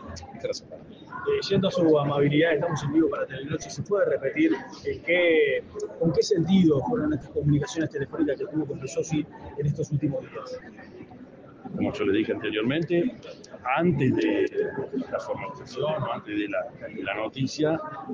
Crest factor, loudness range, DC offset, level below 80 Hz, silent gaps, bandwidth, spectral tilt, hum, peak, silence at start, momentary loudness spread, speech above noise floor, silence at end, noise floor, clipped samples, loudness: 16 dB; 6 LU; under 0.1%; -60 dBFS; none; 7.6 kHz; -6.5 dB/octave; none; -10 dBFS; 0 s; 15 LU; 21 dB; 0 s; -46 dBFS; under 0.1%; -26 LUFS